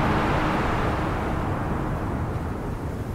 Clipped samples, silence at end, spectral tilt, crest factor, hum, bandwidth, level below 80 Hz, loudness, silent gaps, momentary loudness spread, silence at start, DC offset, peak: under 0.1%; 0 s; -7 dB/octave; 14 dB; none; 16 kHz; -32 dBFS; -26 LUFS; none; 8 LU; 0 s; under 0.1%; -10 dBFS